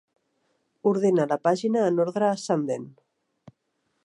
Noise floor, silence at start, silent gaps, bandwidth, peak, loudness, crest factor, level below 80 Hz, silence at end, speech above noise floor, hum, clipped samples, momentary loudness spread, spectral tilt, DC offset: -75 dBFS; 0.85 s; none; 11 kHz; -8 dBFS; -24 LUFS; 18 dB; -78 dBFS; 1.15 s; 52 dB; none; under 0.1%; 5 LU; -6.5 dB/octave; under 0.1%